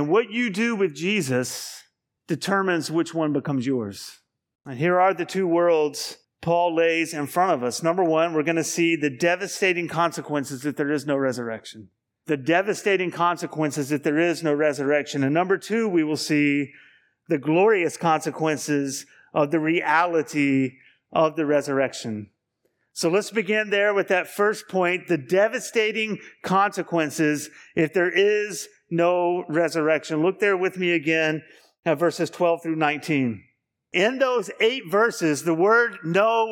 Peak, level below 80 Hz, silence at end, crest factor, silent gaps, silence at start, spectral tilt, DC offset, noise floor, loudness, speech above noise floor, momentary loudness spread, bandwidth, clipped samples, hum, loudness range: -6 dBFS; -74 dBFS; 0 s; 18 dB; 31.79-31.83 s; 0 s; -5 dB/octave; under 0.1%; -72 dBFS; -23 LUFS; 50 dB; 9 LU; 17.5 kHz; under 0.1%; none; 3 LU